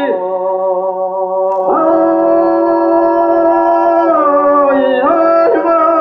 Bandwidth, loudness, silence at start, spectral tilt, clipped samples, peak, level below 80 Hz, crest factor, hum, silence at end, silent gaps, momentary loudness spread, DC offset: 5.8 kHz; -11 LUFS; 0 s; -8 dB/octave; under 0.1%; -2 dBFS; -54 dBFS; 8 dB; none; 0 s; none; 6 LU; under 0.1%